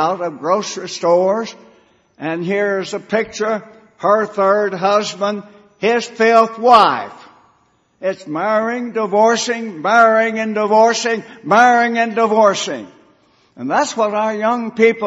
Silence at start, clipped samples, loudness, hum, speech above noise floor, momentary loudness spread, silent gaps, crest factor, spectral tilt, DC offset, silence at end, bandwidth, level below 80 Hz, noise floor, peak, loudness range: 0 s; under 0.1%; -15 LUFS; none; 43 dB; 13 LU; none; 16 dB; -4 dB/octave; under 0.1%; 0 s; 8.2 kHz; -64 dBFS; -58 dBFS; 0 dBFS; 5 LU